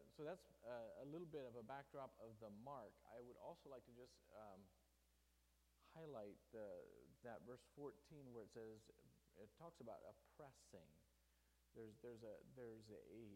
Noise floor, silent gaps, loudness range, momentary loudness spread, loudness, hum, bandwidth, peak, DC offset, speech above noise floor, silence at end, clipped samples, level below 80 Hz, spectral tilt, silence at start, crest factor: -81 dBFS; none; 6 LU; 11 LU; -60 LUFS; none; 15.5 kHz; -42 dBFS; under 0.1%; 21 dB; 0 s; under 0.1%; -82 dBFS; -6.5 dB/octave; 0 s; 18 dB